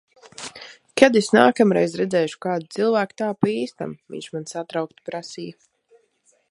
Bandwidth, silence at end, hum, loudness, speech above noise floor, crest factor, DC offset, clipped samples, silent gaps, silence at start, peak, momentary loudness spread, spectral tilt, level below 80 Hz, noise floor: 11.5 kHz; 1 s; none; -21 LUFS; 43 dB; 22 dB; under 0.1%; under 0.1%; none; 0.4 s; 0 dBFS; 20 LU; -5 dB/octave; -66 dBFS; -64 dBFS